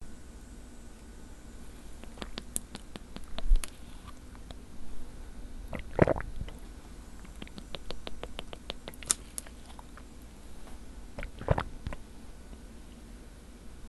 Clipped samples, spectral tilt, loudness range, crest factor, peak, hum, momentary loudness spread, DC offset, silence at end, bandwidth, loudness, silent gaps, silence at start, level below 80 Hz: under 0.1%; -4 dB/octave; 5 LU; 34 dB; -2 dBFS; none; 19 LU; under 0.1%; 0 s; 12.5 kHz; -37 LUFS; none; 0 s; -40 dBFS